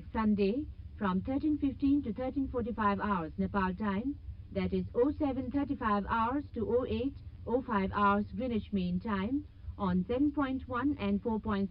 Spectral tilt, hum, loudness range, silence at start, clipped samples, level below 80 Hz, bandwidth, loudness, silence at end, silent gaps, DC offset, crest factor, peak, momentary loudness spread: -10.5 dB/octave; none; 1 LU; 0 s; under 0.1%; -48 dBFS; 5.2 kHz; -33 LUFS; 0 s; none; under 0.1%; 16 dB; -16 dBFS; 7 LU